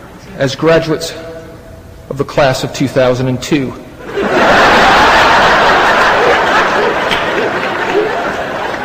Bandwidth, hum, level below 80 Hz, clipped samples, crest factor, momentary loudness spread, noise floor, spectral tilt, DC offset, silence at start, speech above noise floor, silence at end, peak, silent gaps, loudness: 15.5 kHz; none; -34 dBFS; under 0.1%; 12 dB; 16 LU; -32 dBFS; -4.5 dB/octave; under 0.1%; 0 s; 21 dB; 0 s; 0 dBFS; none; -10 LUFS